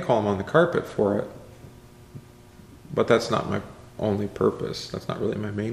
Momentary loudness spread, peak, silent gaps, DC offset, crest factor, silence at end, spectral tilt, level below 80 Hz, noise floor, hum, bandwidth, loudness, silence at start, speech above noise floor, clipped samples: 24 LU; -4 dBFS; none; under 0.1%; 22 dB; 0 s; -6.5 dB/octave; -54 dBFS; -48 dBFS; none; 14.5 kHz; -25 LUFS; 0 s; 24 dB; under 0.1%